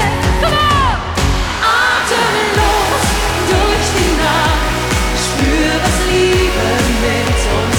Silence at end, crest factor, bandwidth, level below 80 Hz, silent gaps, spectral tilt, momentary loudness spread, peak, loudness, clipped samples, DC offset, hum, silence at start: 0 s; 12 dB; 20 kHz; -20 dBFS; none; -4 dB/octave; 3 LU; 0 dBFS; -13 LUFS; under 0.1%; under 0.1%; none; 0 s